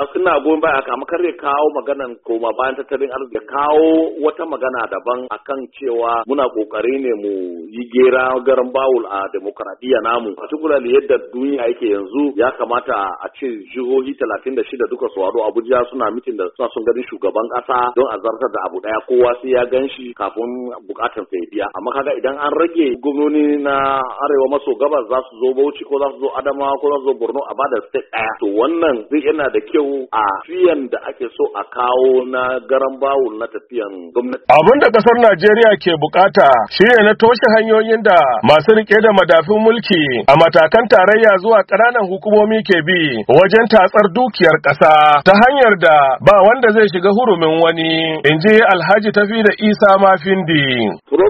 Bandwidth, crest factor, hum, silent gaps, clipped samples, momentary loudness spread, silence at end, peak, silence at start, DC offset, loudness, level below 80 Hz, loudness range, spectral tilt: 7 kHz; 14 dB; none; none; 0.1%; 13 LU; 0 s; 0 dBFS; 0 s; under 0.1%; -14 LUFS; -52 dBFS; 9 LU; -7 dB/octave